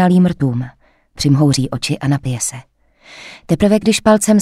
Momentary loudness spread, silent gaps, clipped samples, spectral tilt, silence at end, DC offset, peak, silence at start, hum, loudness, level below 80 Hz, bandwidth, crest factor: 20 LU; none; under 0.1%; -5.5 dB/octave; 0 s; under 0.1%; 0 dBFS; 0 s; none; -15 LUFS; -42 dBFS; 15.5 kHz; 14 dB